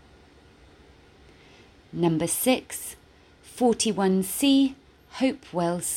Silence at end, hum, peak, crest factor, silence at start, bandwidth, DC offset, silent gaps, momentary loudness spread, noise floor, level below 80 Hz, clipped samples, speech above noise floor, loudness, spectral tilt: 0 s; none; -10 dBFS; 18 dB; 1.95 s; 17 kHz; under 0.1%; none; 15 LU; -54 dBFS; -58 dBFS; under 0.1%; 30 dB; -25 LUFS; -4.5 dB/octave